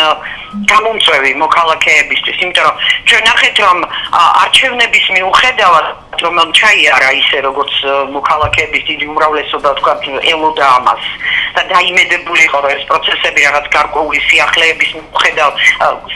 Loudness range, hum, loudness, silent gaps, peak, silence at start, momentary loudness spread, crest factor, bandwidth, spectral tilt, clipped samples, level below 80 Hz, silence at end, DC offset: 4 LU; none; -9 LUFS; none; 0 dBFS; 0 s; 7 LU; 10 dB; 16 kHz; -1.5 dB/octave; 0.5%; -40 dBFS; 0 s; under 0.1%